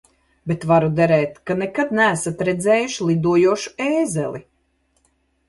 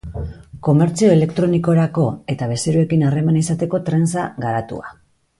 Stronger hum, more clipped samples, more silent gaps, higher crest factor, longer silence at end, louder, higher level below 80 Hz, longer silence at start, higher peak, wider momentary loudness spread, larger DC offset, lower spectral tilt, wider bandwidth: neither; neither; neither; about the same, 16 dB vs 16 dB; first, 1.05 s vs 0.5 s; about the same, -19 LUFS vs -17 LUFS; second, -54 dBFS vs -42 dBFS; first, 0.45 s vs 0.05 s; about the same, -4 dBFS vs -2 dBFS; second, 9 LU vs 16 LU; neither; second, -5.5 dB/octave vs -7 dB/octave; about the same, 11.5 kHz vs 11.5 kHz